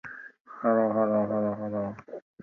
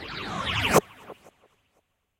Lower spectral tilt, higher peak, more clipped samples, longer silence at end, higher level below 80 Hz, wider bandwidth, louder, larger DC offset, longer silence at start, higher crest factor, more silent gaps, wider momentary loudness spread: first, -11 dB/octave vs -3.5 dB/octave; second, -14 dBFS vs -6 dBFS; neither; second, 0.25 s vs 0.9 s; second, -66 dBFS vs -48 dBFS; second, 2.9 kHz vs 16 kHz; about the same, -27 LUFS vs -25 LUFS; neither; about the same, 0.05 s vs 0 s; second, 16 dB vs 24 dB; first, 0.40-0.45 s vs none; second, 20 LU vs 24 LU